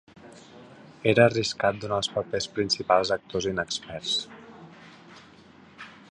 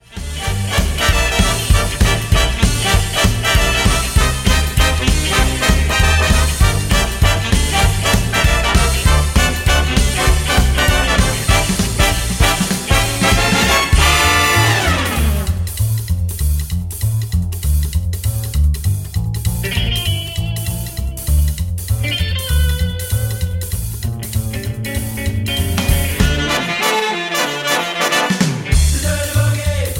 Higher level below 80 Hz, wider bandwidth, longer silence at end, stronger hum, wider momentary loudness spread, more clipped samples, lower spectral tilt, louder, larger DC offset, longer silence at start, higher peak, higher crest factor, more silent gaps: second, -58 dBFS vs -18 dBFS; second, 10.5 kHz vs 17 kHz; first, 0.2 s vs 0 s; neither; first, 25 LU vs 8 LU; neither; about the same, -4 dB/octave vs -4 dB/octave; second, -25 LUFS vs -16 LUFS; neither; first, 0.25 s vs 0.1 s; second, -4 dBFS vs 0 dBFS; first, 24 dB vs 14 dB; neither